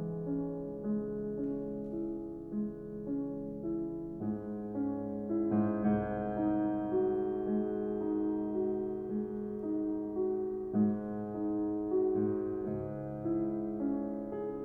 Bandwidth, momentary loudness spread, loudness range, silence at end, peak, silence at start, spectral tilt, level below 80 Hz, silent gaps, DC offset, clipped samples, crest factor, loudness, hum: 3.3 kHz; 7 LU; 5 LU; 0 s; -20 dBFS; 0 s; -11.5 dB/octave; -60 dBFS; none; under 0.1%; under 0.1%; 14 dB; -35 LUFS; none